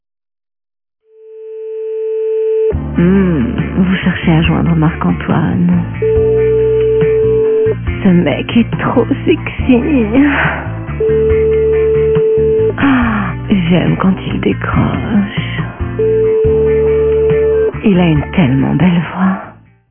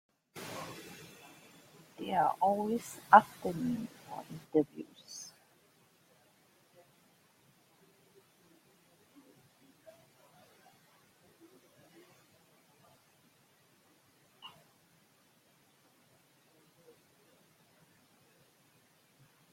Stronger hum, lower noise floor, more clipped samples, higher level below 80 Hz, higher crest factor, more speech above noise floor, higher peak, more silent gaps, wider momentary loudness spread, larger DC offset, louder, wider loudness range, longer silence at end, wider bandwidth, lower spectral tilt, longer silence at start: neither; second, -33 dBFS vs -68 dBFS; neither; first, -28 dBFS vs -80 dBFS; second, 12 dB vs 34 dB; second, 22 dB vs 38 dB; first, 0 dBFS vs -6 dBFS; neither; second, 6 LU vs 30 LU; neither; first, -12 LUFS vs -32 LUFS; second, 2 LU vs 16 LU; second, 0.4 s vs 5.05 s; second, 3.5 kHz vs 16.5 kHz; first, -12 dB/octave vs -5 dB/octave; first, 1.25 s vs 0.35 s